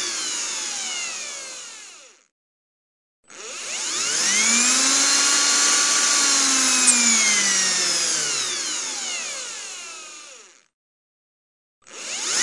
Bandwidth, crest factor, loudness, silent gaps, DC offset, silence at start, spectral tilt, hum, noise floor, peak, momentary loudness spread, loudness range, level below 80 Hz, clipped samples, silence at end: 12 kHz; 20 dB; -18 LUFS; 2.31-3.23 s, 10.74-11.82 s; under 0.1%; 0 s; 1.5 dB/octave; none; -46 dBFS; -2 dBFS; 19 LU; 16 LU; -80 dBFS; under 0.1%; 0 s